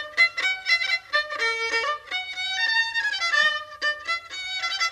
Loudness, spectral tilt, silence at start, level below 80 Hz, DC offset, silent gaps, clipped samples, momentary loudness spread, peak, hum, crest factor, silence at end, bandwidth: -23 LUFS; 1.5 dB/octave; 0 s; -64 dBFS; under 0.1%; none; under 0.1%; 8 LU; -8 dBFS; none; 16 dB; 0 s; 13.5 kHz